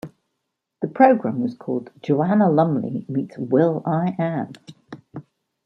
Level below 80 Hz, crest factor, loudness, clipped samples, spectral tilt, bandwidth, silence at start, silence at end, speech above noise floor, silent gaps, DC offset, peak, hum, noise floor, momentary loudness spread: -68 dBFS; 20 dB; -21 LUFS; under 0.1%; -10 dB/octave; 6.4 kHz; 0.05 s; 0.45 s; 58 dB; none; under 0.1%; -2 dBFS; none; -78 dBFS; 23 LU